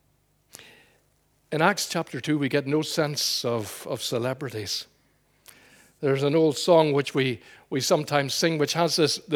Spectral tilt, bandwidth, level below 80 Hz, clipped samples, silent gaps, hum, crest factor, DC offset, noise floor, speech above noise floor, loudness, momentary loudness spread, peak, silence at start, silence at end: -4 dB/octave; 20 kHz; -70 dBFS; under 0.1%; none; none; 22 dB; under 0.1%; -67 dBFS; 42 dB; -25 LUFS; 10 LU; -4 dBFS; 0.6 s; 0 s